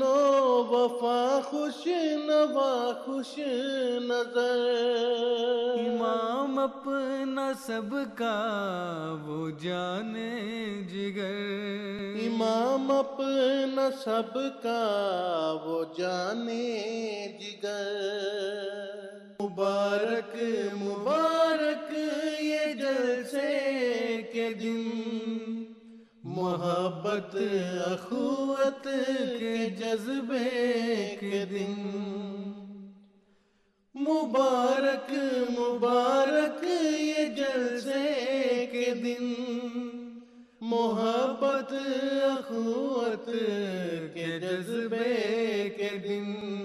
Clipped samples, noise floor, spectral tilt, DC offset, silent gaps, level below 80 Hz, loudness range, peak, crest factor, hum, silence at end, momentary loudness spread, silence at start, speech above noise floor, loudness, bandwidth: under 0.1%; -69 dBFS; -5 dB/octave; under 0.1%; none; -78 dBFS; 5 LU; -12 dBFS; 16 dB; none; 0 s; 9 LU; 0 s; 40 dB; -29 LUFS; 13 kHz